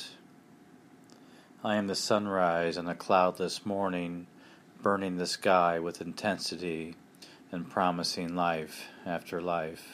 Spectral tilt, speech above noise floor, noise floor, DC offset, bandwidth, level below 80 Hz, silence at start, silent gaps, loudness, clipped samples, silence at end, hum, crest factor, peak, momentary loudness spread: -4.5 dB/octave; 26 dB; -56 dBFS; under 0.1%; 15.5 kHz; -70 dBFS; 0 s; none; -31 LUFS; under 0.1%; 0 s; none; 22 dB; -10 dBFS; 16 LU